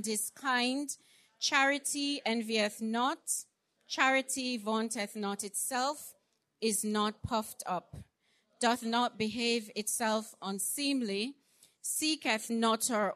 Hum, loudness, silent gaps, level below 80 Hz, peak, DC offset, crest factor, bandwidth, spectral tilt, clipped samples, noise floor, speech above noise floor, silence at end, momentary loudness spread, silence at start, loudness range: none; -32 LUFS; none; -68 dBFS; -12 dBFS; under 0.1%; 22 dB; 13.5 kHz; -2 dB/octave; under 0.1%; -74 dBFS; 41 dB; 0 s; 9 LU; 0 s; 3 LU